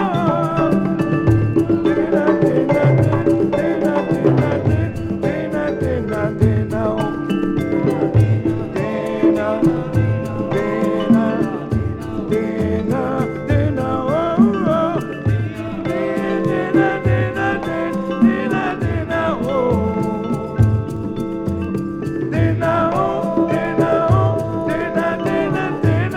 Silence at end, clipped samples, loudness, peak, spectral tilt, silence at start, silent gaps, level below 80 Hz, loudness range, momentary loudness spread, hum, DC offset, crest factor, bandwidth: 0 s; under 0.1%; -18 LUFS; -2 dBFS; -8.5 dB/octave; 0 s; none; -38 dBFS; 3 LU; 6 LU; none; under 0.1%; 16 dB; 12 kHz